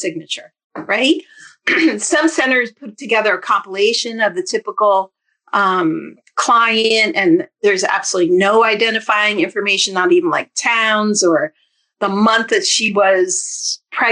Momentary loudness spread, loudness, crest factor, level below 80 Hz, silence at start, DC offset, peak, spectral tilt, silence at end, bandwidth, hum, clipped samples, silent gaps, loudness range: 9 LU; -15 LUFS; 14 dB; -70 dBFS; 0 s; under 0.1%; -2 dBFS; -2.5 dB/octave; 0 s; 10.5 kHz; none; under 0.1%; 0.64-0.70 s; 3 LU